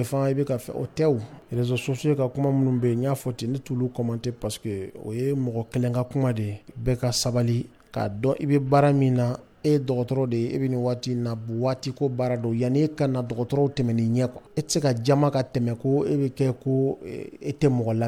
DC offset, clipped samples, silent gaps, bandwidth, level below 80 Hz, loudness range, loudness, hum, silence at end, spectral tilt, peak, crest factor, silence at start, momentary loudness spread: under 0.1%; under 0.1%; none; 15.5 kHz; -52 dBFS; 4 LU; -25 LUFS; none; 0 s; -7 dB/octave; -8 dBFS; 16 dB; 0 s; 8 LU